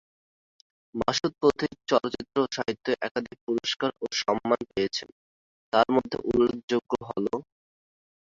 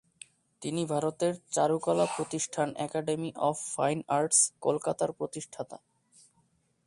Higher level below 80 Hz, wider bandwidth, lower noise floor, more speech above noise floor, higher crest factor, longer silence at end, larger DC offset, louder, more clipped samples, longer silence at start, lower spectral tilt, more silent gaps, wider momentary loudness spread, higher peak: first, -58 dBFS vs -72 dBFS; second, 7.8 kHz vs 11.5 kHz; first, under -90 dBFS vs -71 dBFS; first, over 63 dB vs 41 dB; about the same, 22 dB vs 22 dB; second, 0.85 s vs 1.1 s; neither; first, -27 LUFS vs -30 LUFS; neither; first, 0.95 s vs 0.6 s; about the same, -4.5 dB/octave vs -4 dB/octave; first, 3.11-3.15 s, 3.41-3.47 s, 5.12-5.72 s, 6.64-6.68 s vs none; second, 7 LU vs 14 LU; first, -6 dBFS vs -10 dBFS